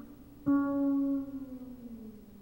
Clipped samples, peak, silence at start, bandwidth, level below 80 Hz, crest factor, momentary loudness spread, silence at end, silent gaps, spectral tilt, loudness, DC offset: under 0.1%; -20 dBFS; 0 s; 16 kHz; -60 dBFS; 14 dB; 19 LU; 0 s; none; -9 dB/octave; -32 LUFS; under 0.1%